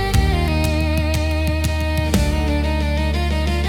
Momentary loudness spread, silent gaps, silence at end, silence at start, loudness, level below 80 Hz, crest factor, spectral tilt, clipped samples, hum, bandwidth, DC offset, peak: 2 LU; none; 0 s; 0 s; -19 LUFS; -22 dBFS; 16 dB; -6 dB/octave; under 0.1%; none; 17 kHz; under 0.1%; -2 dBFS